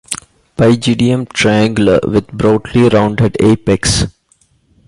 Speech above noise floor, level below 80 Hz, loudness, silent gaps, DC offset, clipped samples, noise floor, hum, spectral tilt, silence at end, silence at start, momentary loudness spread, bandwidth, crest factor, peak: 43 dB; -34 dBFS; -12 LUFS; none; under 0.1%; under 0.1%; -54 dBFS; none; -5.5 dB/octave; 0.8 s; 0.1 s; 5 LU; 12 kHz; 12 dB; 0 dBFS